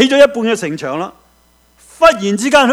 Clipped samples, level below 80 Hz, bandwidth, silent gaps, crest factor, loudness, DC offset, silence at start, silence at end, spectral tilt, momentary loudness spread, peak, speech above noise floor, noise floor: 0.5%; -48 dBFS; 16 kHz; none; 14 dB; -13 LUFS; under 0.1%; 0 s; 0 s; -4 dB/octave; 12 LU; 0 dBFS; 40 dB; -52 dBFS